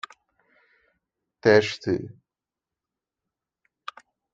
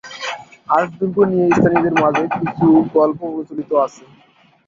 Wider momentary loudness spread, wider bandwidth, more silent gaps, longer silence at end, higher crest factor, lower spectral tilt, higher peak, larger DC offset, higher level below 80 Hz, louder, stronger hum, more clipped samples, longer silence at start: first, 23 LU vs 13 LU; about the same, 7.8 kHz vs 7.4 kHz; neither; first, 2.25 s vs 0.8 s; first, 24 dB vs 16 dB; second, -5.5 dB/octave vs -7 dB/octave; second, -4 dBFS vs 0 dBFS; neither; second, -66 dBFS vs -54 dBFS; second, -22 LUFS vs -17 LUFS; neither; neither; first, 1.45 s vs 0.05 s